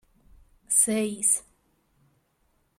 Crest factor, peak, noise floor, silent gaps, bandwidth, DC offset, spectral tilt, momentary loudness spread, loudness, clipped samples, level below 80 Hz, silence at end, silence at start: 22 dB; -8 dBFS; -70 dBFS; none; 16 kHz; under 0.1%; -2.5 dB/octave; 3 LU; -23 LUFS; under 0.1%; -62 dBFS; 1.4 s; 0.7 s